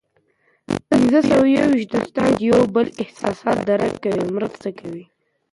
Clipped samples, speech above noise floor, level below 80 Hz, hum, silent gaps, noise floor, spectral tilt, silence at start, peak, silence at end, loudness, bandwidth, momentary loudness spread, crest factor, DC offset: under 0.1%; 44 dB; -52 dBFS; none; none; -63 dBFS; -6.5 dB/octave; 0.7 s; -4 dBFS; 0.5 s; -18 LUFS; 11.5 kHz; 14 LU; 14 dB; under 0.1%